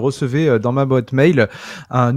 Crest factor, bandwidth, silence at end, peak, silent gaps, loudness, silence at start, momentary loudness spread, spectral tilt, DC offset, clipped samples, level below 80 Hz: 16 dB; 11 kHz; 0 s; 0 dBFS; none; -16 LUFS; 0 s; 7 LU; -7.5 dB/octave; under 0.1%; under 0.1%; -52 dBFS